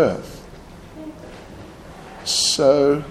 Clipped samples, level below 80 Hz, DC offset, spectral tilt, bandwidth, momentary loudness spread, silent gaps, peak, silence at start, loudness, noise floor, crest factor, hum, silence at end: under 0.1%; -48 dBFS; under 0.1%; -3 dB/octave; 14.5 kHz; 25 LU; none; -4 dBFS; 0 s; -18 LUFS; -40 dBFS; 18 dB; none; 0 s